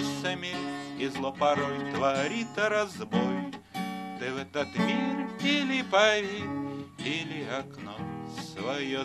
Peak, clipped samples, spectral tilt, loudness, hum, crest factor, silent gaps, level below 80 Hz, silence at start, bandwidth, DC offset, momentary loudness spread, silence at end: -10 dBFS; under 0.1%; -4.5 dB/octave; -30 LUFS; none; 20 dB; none; -68 dBFS; 0 s; 13 kHz; under 0.1%; 11 LU; 0 s